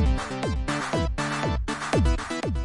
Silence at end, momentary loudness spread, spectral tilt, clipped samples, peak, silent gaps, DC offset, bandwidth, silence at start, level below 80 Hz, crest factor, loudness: 0 s; 5 LU; -5.5 dB/octave; under 0.1%; -10 dBFS; none; under 0.1%; 11.5 kHz; 0 s; -30 dBFS; 16 dB; -27 LUFS